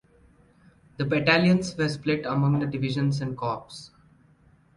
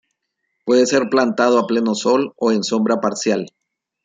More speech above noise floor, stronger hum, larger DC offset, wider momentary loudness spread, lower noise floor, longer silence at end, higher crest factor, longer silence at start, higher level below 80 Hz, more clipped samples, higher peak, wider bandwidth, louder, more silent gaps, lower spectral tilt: second, 34 dB vs 57 dB; neither; neither; first, 12 LU vs 6 LU; second, -59 dBFS vs -74 dBFS; first, 0.9 s vs 0.55 s; first, 22 dB vs 16 dB; first, 1 s vs 0.65 s; first, -58 dBFS vs -64 dBFS; neither; about the same, -4 dBFS vs -2 dBFS; first, 11 kHz vs 9.4 kHz; second, -25 LUFS vs -17 LUFS; neither; first, -6.5 dB/octave vs -4.5 dB/octave